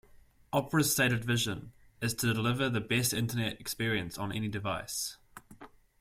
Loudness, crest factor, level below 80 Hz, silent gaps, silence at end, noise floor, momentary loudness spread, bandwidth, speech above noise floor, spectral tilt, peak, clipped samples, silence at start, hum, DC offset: -31 LUFS; 18 dB; -58 dBFS; none; 0.35 s; -59 dBFS; 9 LU; 16.5 kHz; 28 dB; -4 dB/octave; -16 dBFS; under 0.1%; 0.15 s; none; under 0.1%